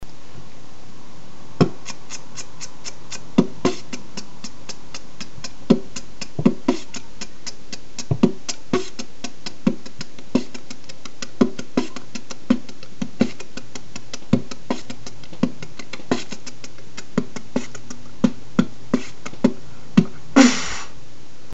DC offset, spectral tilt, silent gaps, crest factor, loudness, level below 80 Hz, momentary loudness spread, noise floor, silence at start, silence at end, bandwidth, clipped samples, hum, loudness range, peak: 7%; -5 dB/octave; none; 24 dB; -24 LUFS; -52 dBFS; 19 LU; -46 dBFS; 0 s; 0.55 s; 8.2 kHz; under 0.1%; none; 7 LU; 0 dBFS